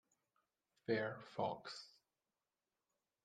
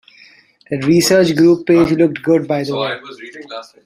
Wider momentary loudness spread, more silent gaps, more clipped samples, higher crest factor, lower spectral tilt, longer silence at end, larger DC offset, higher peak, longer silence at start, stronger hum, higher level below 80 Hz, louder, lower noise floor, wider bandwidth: second, 13 LU vs 20 LU; neither; neither; first, 22 dB vs 14 dB; about the same, -5.5 dB/octave vs -5.5 dB/octave; first, 1.35 s vs 0.25 s; neither; second, -26 dBFS vs -2 dBFS; first, 0.9 s vs 0.7 s; neither; second, -88 dBFS vs -52 dBFS; second, -45 LUFS vs -14 LUFS; first, under -90 dBFS vs -47 dBFS; second, 9.4 kHz vs 16 kHz